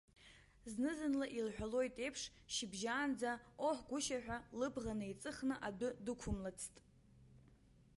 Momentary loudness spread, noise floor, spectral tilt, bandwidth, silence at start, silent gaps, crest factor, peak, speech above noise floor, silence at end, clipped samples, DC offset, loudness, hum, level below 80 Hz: 8 LU; -68 dBFS; -4 dB/octave; 11.5 kHz; 0.2 s; none; 16 dB; -28 dBFS; 25 dB; 0.6 s; under 0.1%; under 0.1%; -43 LUFS; none; -62 dBFS